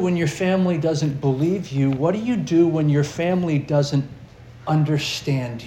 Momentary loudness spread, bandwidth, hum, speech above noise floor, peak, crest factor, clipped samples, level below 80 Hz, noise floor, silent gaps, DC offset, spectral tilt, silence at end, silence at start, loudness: 5 LU; 12.5 kHz; none; 22 dB; -6 dBFS; 14 dB; under 0.1%; -52 dBFS; -42 dBFS; none; under 0.1%; -7 dB/octave; 0 s; 0 s; -21 LUFS